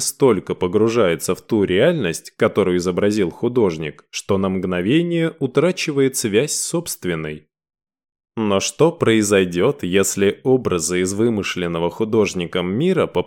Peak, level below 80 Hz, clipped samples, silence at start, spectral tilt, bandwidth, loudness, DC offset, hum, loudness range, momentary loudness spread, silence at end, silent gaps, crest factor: -4 dBFS; -52 dBFS; under 0.1%; 0 s; -5 dB/octave; 17.5 kHz; -19 LUFS; under 0.1%; none; 3 LU; 7 LU; 0 s; none; 16 dB